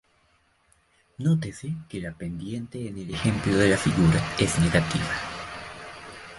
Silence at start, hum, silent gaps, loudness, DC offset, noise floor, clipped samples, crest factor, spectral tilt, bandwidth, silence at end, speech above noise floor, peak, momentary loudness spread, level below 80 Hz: 1.2 s; none; none; -25 LUFS; under 0.1%; -65 dBFS; under 0.1%; 20 dB; -5.5 dB/octave; 11.5 kHz; 0 s; 40 dB; -6 dBFS; 16 LU; -44 dBFS